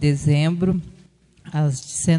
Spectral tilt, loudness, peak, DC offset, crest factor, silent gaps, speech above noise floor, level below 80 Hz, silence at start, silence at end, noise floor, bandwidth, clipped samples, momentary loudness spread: -6 dB/octave; -21 LUFS; -6 dBFS; under 0.1%; 16 dB; none; 33 dB; -46 dBFS; 0 s; 0 s; -52 dBFS; 11 kHz; under 0.1%; 8 LU